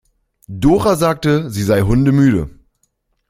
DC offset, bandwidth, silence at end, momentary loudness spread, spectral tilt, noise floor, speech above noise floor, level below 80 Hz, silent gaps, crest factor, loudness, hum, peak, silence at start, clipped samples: under 0.1%; 16 kHz; 0.8 s; 8 LU; -7 dB/octave; -65 dBFS; 52 dB; -34 dBFS; none; 14 dB; -14 LUFS; none; -2 dBFS; 0.5 s; under 0.1%